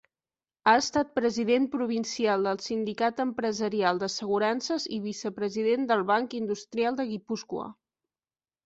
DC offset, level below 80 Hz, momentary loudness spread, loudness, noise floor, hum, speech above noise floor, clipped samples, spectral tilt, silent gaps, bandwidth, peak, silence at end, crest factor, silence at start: under 0.1%; -68 dBFS; 8 LU; -28 LUFS; under -90 dBFS; none; over 63 dB; under 0.1%; -4 dB/octave; none; 8 kHz; -8 dBFS; 0.95 s; 20 dB; 0.65 s